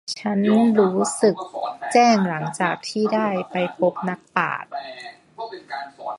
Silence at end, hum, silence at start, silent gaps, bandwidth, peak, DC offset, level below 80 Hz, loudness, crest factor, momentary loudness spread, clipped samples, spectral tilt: 0 s; none; 0.05 s; none; 11.5 kHz; -2 dBFS; under 0.1%; -68 dBFS; -21 LUFS; 20 dB; 17 LU; under 0.1%; -5 dB/octave